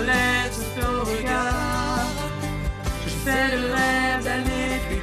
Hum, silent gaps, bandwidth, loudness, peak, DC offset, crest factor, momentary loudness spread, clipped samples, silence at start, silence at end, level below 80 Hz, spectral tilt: none; none; 15 kHz; -24 LUFS; -8 dBFS; under 0.1%; 14 dB; 8 LU; under 0.1%; 0 s; 0 s; -32 dBFS; -4.5 dB/octave